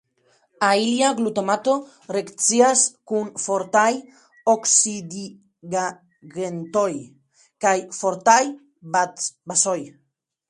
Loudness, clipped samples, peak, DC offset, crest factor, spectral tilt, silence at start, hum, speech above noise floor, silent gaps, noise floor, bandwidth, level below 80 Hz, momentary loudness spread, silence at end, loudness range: -21 LUFS; under 0.1%; 0 dBFS; under 0.1%; 22 dB; -2.5 dB/octave; 0.6 s; none; 42 dB; none; -63 dBFS; 11.5 kHz; -72 dBFS; 14 LU; 0.6 s; 4 LU